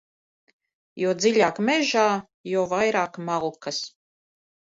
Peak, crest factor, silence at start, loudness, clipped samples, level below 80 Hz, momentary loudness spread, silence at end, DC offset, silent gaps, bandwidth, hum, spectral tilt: -6 dBFS; 18 dB; 0.95 s; -24 LUFS; under 0.1%; -70 dBFS; 10 LU; 0.9 s; under 0.1%; 2.34-2.44 s; 8 kHz; none; -4 dB/octave